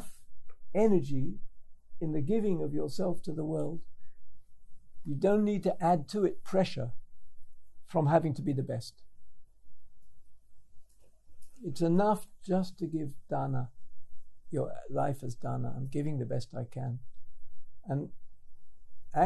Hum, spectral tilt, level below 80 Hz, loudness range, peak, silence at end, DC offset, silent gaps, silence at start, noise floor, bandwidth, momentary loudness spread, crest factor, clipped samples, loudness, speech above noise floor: none; -8 dB/octave; -58 dBFS; 6 LU; -12 dBFS; 0 s; under 0.1%; none; 0 s; -51 dBFS; 12.5 kHz; 13 LU; 18 dB; under 0.1%; -33 LUFS; 22 dB